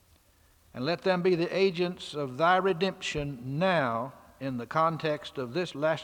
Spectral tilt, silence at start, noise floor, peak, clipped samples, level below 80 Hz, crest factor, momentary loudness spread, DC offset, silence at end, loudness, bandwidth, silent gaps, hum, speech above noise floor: -6 dB/octave; 0.75 s; -63 dBFS; -10 dBFS; under 0.1%; -60 dBFS; 20 dB; 10 LU; under 0.1%; 0 s; -29 LUFS; 16.5 kHz; none; none; 34 dB